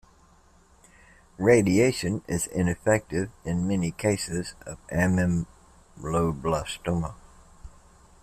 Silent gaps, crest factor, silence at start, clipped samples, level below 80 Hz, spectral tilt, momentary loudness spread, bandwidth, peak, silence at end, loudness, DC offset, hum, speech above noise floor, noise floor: none; 20 dB; 1.4 s; under 0.1%; -48 dBFS; -5.5 dB/octave; 11 LU; 14.5 kHz; -6 dBFS; 0.55 s; -26 LUFS; under 0.1%; none; 32 dB; -58 dBFS